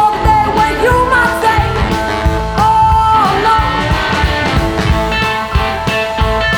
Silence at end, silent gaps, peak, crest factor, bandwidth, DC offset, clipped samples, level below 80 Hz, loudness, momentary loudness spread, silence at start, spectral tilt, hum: 0 s; none; 0 dBFS; 12 dB; over 20 kHz; under 0.1%; under 0.1%; -20 dBFS; -12 LUFS; 5 LU; 0 s; -5.5 dB/octave; none